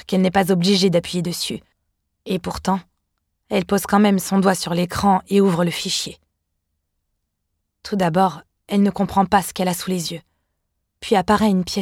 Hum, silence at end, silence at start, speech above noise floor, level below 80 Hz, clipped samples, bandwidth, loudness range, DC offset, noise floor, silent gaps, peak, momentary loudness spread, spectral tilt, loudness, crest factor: none; 0 s; 0.1 s; 56 dB; -48 dBFS; under 0.1%; 16.5 kHz; 5 LU; under 0.1%; -75 dBFS; none; -2 dBFS; 10 LU; -5 dB/octave; -19 LUFS; 18 dB